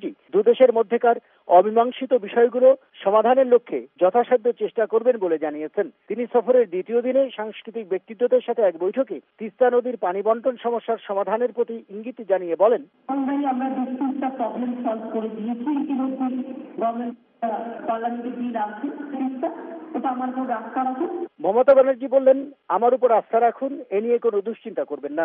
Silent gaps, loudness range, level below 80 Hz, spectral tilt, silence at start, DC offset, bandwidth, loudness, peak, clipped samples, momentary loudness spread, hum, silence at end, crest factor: none; 8 LU; -76 dBFS; -4.5 dB/octave; 0 s; under 0.1%; 3.7 kHz; -22 LUFS; -4 dBFS; under 0.1%; 12 LU; none; 0 s; 18 dB